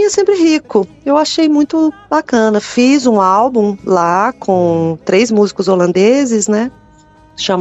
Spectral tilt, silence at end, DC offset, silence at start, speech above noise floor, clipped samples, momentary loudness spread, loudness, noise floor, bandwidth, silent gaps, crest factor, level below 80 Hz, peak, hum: -5 dB/octave; 0 s; under 0.1%; 0 s; 32 dB; under 0.1%; 5 LU; -12 LUFS; -44 dBFS; 8.4 kHz; none; 12 dB; -52 dBFS; 0 dBFS; none